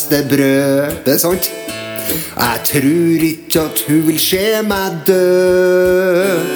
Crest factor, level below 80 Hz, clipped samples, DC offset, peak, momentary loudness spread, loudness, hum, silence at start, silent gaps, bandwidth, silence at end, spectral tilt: 14 dB; -44 dBFS; under 0.1%; under 0.1%; 0 dBFS; 7 LU; -13 LUFS; none; 0 s; none; over 20 kHz; 0 s; -4.5 dB/octave